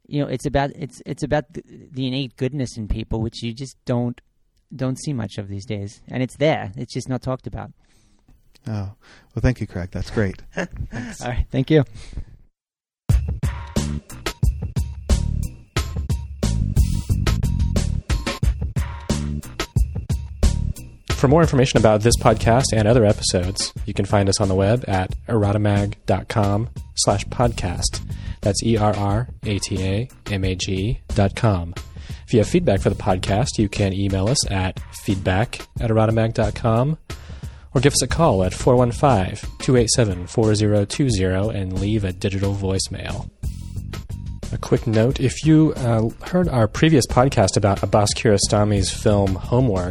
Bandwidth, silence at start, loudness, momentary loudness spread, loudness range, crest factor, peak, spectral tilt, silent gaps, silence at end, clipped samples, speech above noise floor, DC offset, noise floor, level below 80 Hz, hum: 14.5 kHz; 0.1 s; -21 LUFS; 14 LU; 9 LU; 20 dB; 0 dBFS; -5.5 dB/octave; none; 0 s; under 0.1%; over 70 dB; under 0.1%; under -90 dBFS; -30 dBFS; none